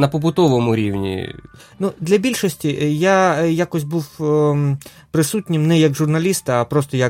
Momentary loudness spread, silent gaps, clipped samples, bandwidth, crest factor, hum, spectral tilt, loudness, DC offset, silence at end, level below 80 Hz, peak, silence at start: 10 LU; none; under 0.1%; 16.5 kHz; 14 dB; none; -6 dB/octave; -18 LUFS; under 0.1%; 0 s; -52 dBFS; -2 dBFS; 0 s